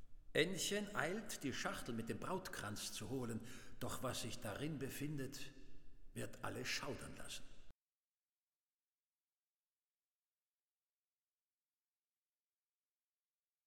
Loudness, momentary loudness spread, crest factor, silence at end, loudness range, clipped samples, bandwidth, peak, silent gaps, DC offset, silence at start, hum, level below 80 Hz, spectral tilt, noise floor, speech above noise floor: -45 LUFS; 12 LU; 24 dB; 5.95 s; 8 LU; under 0.1%; 18 kHz; -22 dBFS; none; under 0.1%; 0 s; none; -64 dBFS; -3.5 dB/octave; under -90 dBFS; over 45 dB